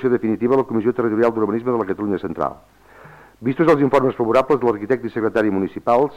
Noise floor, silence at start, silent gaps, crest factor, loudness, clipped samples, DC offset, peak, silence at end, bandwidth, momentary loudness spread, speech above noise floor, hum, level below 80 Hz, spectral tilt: -44 dBFS; 0 s; none; 14 dB; -19 LUFS; under 0.1%; under 0.1%; -6 dBFS; 0 s; 9.8 kHz; 8 LU; 26 dB; none; -54 dBFS; -8 dB/octave